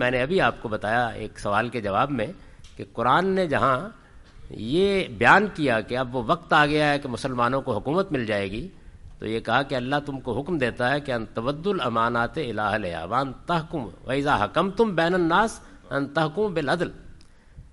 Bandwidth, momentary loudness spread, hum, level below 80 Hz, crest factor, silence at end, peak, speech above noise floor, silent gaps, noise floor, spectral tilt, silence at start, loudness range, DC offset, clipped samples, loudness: 11.5 kHz; 10 LU; none; -48 dBFS; 22 dB; 0.1 s; -2 dBFS; 23 dB; none; -47 dBFS; -6 dB/octave; 0 s; 5 LU; under 0.1%; under 0.1%; -24 LUFS